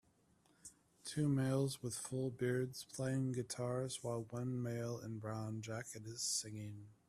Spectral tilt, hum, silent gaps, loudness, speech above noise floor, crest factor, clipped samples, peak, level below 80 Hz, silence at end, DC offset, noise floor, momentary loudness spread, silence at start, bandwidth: -5 dB/octave; none; none; -41 LUFS; 32 dB; 16 dB; under 0.1%; -26 dBFS; -74 dBFS; 0.15 s; under 0.1%; -73 dBFS; 12 LU; 0.65 s; 14.5 kHz